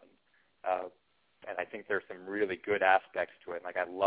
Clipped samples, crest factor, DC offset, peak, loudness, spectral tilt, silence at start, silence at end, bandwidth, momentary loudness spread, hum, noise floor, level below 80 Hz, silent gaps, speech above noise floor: under 0.1%; 22 dB; under 0.1%; -12 dBFS; -33 LUFS; -1.5 dB/octave; 0.65 s; 0 s; 4 kHz; 15 LU; none; -72 dBFS; -72 dBFS; none; 39 dB